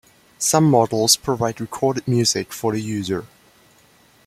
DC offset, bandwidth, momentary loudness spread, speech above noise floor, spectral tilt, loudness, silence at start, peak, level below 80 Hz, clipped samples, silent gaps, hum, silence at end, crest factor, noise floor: under 0.1%; 16 kHz; 9 LU; 35 dB; -4 dB/octave; -19 LUFS; 0.4 s; 0 dBFS; -56 dBFS; under 0.1%; none; none; 1 s; 20 dB; -54 dBFS